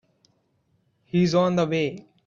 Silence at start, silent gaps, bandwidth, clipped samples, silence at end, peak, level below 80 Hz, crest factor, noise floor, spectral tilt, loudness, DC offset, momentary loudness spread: 1.15 s; none; 7.4 kHz; under 0.1%; 0.25 s; -8 dBFS; -64 dBFS; 18 dB; -68 dBFS; -6.5 dB/octave; -23 LUFS; under 0.1%; 7 LU